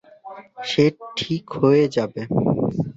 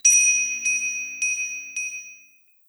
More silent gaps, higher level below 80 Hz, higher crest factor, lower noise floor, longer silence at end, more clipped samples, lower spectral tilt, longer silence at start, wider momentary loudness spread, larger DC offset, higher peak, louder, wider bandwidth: neither; first, -54 dBFS vs -82 dBFS; about the same, 18 dB vs 18 dB; second, -41 dBFS vs -55 dBFS; second, 0.05 s vs 0.55 s; neither; first, -7 dB/octave vs 5 dB/octave; first, 0.25 s vs 0.05 s; first, 19 LU vs 15 LU; neither; about the same, -4 dBFS vs -6 dBFS; about the same, -21 LUFS vs -21 LUFS; second, 8 kHz vs over 20 kHz